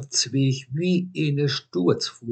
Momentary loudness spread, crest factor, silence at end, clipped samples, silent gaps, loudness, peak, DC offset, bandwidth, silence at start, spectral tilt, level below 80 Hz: 3 LU; 18 dB; 0 s; under 0.1%; none; -24 LUFS; -6 dBFS; under 0.1%; 9 kHz; 0 s; -5 dB/octave; -74 dBFS